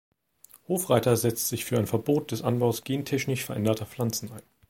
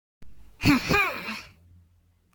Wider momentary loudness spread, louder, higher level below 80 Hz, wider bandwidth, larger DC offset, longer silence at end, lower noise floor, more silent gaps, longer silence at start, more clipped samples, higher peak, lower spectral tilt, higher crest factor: second, 7 LU vs 15 LU; second, -27 LUFS vs -24 LUFS; second, -62 dBFS vs -46 dBFS; second, 17 kHz vs 19.5 kHz; neither; second, 0.3 s vs 0.85 s; second, -57 dBFS vs -63 dBFS; neither; first, 0.7 s vs 0.2 s; neither; about the same, -6 dBFS vs -8 dBFS; about the same, -5 dB/octave vs -5 dB/octave; about the same, 22 dB vs 22 dB